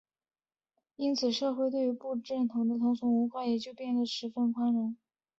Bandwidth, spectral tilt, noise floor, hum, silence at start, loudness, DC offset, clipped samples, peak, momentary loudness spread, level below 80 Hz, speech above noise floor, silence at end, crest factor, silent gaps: 7.6 kHz; -5.5 dB/octave; -84 dBFS; none; 1 s; -31 LUFS; under 0.1%; under 0.1%; -18 dBFS; 6 LU; -78 dBFS; 54 dB; 0.45 s; 14 dB; none